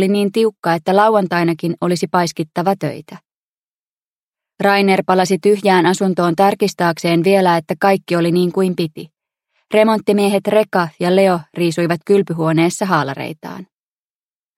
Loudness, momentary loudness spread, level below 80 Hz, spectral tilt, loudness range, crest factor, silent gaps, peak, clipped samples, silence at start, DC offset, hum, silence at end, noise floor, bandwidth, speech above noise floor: -15 LUFS; 8 LU; -64 dBFS; -6 dB/octave; 4 LU; 16 dB; 0.59-0.63 s, 3.34-4.33 s; 0 dBFS; under 0.1%; 0 s; under 0.1%; none; 0.95 s; under -90 dBFS; 15.5 kHz; over 75 dB